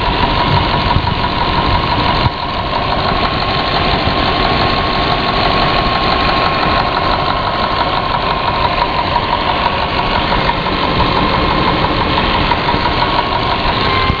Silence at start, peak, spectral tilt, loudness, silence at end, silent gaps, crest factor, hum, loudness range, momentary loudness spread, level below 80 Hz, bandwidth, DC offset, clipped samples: 0 s; 0 dBFS; -6.5 dB/octave; -13 LUFS; 0 s; none; 14 dB; none; 1 LU; 2 LU; -24 dBFS; 5.4 kHz; 0.5%; under 0.1%